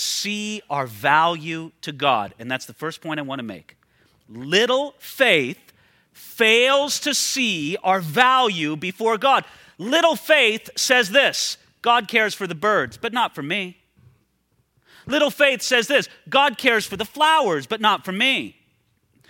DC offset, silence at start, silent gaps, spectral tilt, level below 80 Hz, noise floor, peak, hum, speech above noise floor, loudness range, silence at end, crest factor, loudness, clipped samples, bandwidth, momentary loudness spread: under 0.1%; 0 s; none; -2.5 dB/octave; -66 dBFS; -67 dBFS; -2 dBFS; none; 46 dB; 6 LU; 0.8 s; 20 dB; -19 LUFS; under 0.1%; 17 kHz; 13 LU